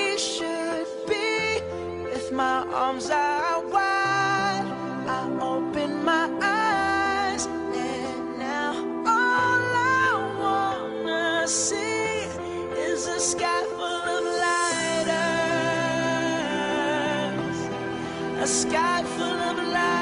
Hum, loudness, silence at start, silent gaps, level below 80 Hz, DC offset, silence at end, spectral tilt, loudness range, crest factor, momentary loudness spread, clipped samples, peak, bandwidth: none; -25 LUFS; 0 s; none; -58 dBFS; under 0.1%; 0 s; -3 dB/octave; 2 LU; 14 dB; 8 LU; under 0.1%; -10 dBFS; 10.5 kHz